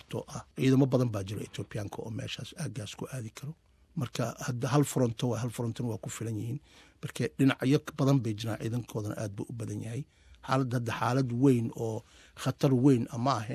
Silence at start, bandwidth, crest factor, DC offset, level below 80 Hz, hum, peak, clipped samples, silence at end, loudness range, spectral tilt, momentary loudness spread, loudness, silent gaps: 0.1 s; 14.5 kHz; 20 dB; under 0.1%; -60 dBFS; none; -10 dBFS; under 0.1%; 0 s; 5 LU; -6.5 dB/octave; 14 LU; -31 LUFS; none